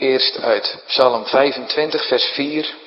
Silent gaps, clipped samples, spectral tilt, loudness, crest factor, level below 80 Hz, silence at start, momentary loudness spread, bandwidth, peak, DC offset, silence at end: none; under 0.1%; -5.5 dB/octave; -17 LUFS; 18 dB; -70 dBFS; 0 s; 5 LU; 5.8 kHz; 0 dBFS; under 0.1%; 0 s